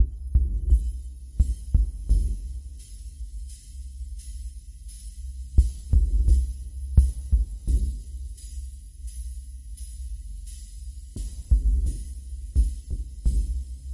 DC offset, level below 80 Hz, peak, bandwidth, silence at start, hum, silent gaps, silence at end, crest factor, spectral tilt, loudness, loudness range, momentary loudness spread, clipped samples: under 0.1%; -26 dBFS; -4 dBFS; 11.5 kHz; 0 s; none; none; 0 s; 20 dB; -7 dB/octave; -28 LUFS; 12 LU; 17 LU; under 0.1%